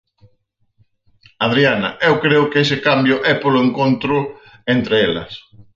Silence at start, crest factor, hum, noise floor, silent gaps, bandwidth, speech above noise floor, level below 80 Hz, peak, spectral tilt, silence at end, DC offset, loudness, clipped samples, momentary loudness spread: 1.4 s; 16 dB; none; -63 dBFS; none; 7.4 kHz; 47 dB; -54 dBFS; 0 dBFS; -6.5 dB/octave; 0.15 s; under 0.1%; -16 LUFS; under 0.1%; 11 LU